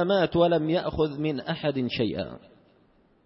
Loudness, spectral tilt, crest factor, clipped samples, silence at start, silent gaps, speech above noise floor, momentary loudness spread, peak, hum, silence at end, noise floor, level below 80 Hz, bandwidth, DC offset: -26 LUFS; -10.5 dB/octave; 16 dB; under 0.1%; 0 s; none; 36 dB; 8 LU; -10 dBFS; none; 0.9 s; -62 dBFS; -52 dBFS; 5.8 kHz; under 0.1%